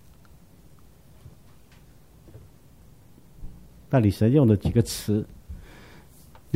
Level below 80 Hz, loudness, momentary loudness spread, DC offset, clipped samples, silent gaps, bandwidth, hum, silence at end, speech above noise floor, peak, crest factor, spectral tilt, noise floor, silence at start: -46 dBFS; -22 LUFS; 28 LU; 0.2%; under 0.1%; none; 16 kHz; none; 1 s; 32 dB; -6 dBFS; 20 dB; -7.5 dB/octave; -53 dBFS; 3.4 s